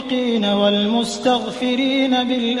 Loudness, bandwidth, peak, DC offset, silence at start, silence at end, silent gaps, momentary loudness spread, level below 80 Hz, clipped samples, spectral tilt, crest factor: -18 LUFS; 11.5 kHz; -4 dBFS; under 0.1%; 0 s; 0 s; none; 3 LU; -56 dBFS; under 0.1%; -4.5 dB/octave; 14 dB